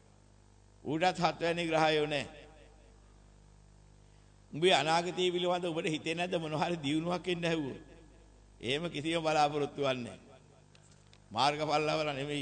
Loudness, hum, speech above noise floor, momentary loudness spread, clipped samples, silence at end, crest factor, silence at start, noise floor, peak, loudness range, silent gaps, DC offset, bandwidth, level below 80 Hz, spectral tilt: -32 LUFS; 50 Hz at -60 dBFS; 29 dB; 12 LU; under 0.1%; 0 s; 22 dB; 0.85 s; -61 dBFS; -12 dBFS; 3 LU; none; under 0.1%; 9 kHz; -62 dBFS; -4.5 dB/octave